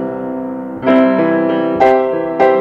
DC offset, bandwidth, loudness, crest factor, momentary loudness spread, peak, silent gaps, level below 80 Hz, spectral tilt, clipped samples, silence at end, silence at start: under 0.1%; 6.8 kHz; -14 LUFS; 12 dB; 11 LU; 0 dBFS; none; -52 dBFS; -8 dB/octave; under 0.1%; 0 s; 0 s